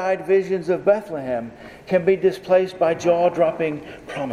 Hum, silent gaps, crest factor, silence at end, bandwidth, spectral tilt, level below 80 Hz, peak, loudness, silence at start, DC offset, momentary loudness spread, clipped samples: none; none; 16 dB; 0 s; 11 kHz; -6.5 dB/octave; -58 dBFS; -4 dBFS; -20 LUFS; 0 s; under 0.1%; 12 LU; under 0.1%